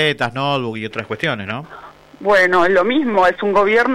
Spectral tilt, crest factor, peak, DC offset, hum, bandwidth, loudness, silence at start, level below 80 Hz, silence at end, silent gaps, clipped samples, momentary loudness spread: -5.5 dB/octave; 12 dB; -4 dBFS; under 0.1%; none; 14 kHz; -16 LUFS; 0 s; -50 dBFS; 0 s; none; under 0.1%; 13 LU